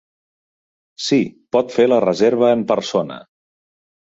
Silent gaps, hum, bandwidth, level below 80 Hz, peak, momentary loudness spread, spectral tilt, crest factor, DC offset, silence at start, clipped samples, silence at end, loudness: none; none; 7.8 kHz; -62 dBFS; -2 dBFS; 10 LU; -5.5 dB/octave; 18 dB; under 0.1%; 1 s; under 0.1%; 0.95 s; -17 LUFS